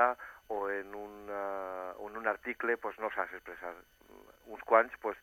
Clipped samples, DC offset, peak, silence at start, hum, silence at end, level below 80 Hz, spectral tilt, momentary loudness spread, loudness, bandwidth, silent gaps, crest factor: under 0.1%; under 0.1%; -10 dBFS; 0 s; none; 0.05 s; -70 dBFS; -5 dB/octave; 17 LU; -35 LUFS; 17.5 kHz; none; 26 dB